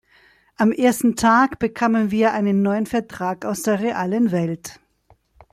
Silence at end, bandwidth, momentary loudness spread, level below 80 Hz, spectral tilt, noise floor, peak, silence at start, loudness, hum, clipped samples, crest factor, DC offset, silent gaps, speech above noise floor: 0.8 s; 15 kHz; 9 LU; -54 dBFS; -5.5 dB/octave; -58 dBFS; -4 dBFS; 0.6 s; -20 LUFS; none; under 0.1%; 16 dB; under 0.1%; none; 39 dB